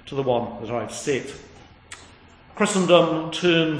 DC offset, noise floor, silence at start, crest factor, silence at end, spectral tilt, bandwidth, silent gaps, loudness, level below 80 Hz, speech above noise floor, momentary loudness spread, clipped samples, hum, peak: under 0.1%; -49 dBFS; 0.05 s; 22 dB; 0 s; -4.5 dB/octave; 10.5 kHz; none; -22 LUFS; -56 dBFS; 27 dB; 25 LU; under 0.1%; none; -2 dBFS